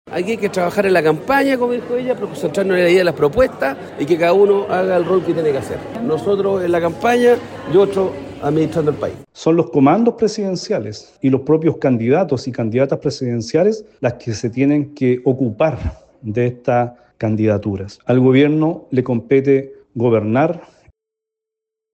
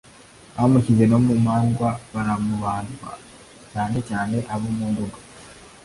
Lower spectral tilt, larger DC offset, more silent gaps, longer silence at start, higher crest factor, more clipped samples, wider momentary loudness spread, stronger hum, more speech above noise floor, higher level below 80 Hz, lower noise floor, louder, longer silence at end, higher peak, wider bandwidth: about the same, -7 dB/octave vs -7.5 dB/octave; neither; neither; second, 0.05 s vs 0.55 s; about the same, 14 dB vs 18 dB; neither; second, 9 LU vs 20 LU; neither; first, 67 dB vs 27 dB; about the same, -46 dBFS vs -48 dBFS; first, -83 dBFS vs -47 dBFS; first, -17 LUFS vs -22 LUFS; first, 1.3 s vs 0.15 s; about the same, -2 dBFS vs -4 dBFS; first, 16.5 kHz vs 11.5 kHz